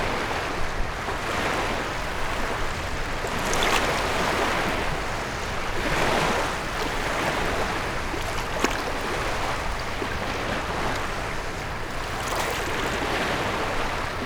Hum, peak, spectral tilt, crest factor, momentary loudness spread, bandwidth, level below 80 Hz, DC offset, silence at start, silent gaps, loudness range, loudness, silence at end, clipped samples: none; -6 dBFS; -3.5 dB/octave; 20 dB; 6 LU; over 20 kHz; -34 dBFS; under 0.1%; 0 s; none; 3 LU; -26 LUFS; 0 s; under 0.1%